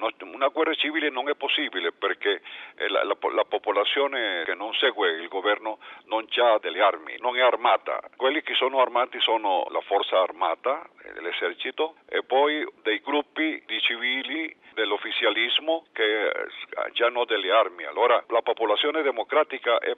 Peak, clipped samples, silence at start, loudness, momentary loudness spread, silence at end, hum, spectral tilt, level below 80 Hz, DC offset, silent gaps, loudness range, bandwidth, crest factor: -8 dBFS; under 0.1%; 0 s; -25 LUFS; 8 LU; 0 s; none; -3.5 dB/octave; -78 dBFS; under 0.1%; none; 3 LU; 7.2 kHz; 18 dB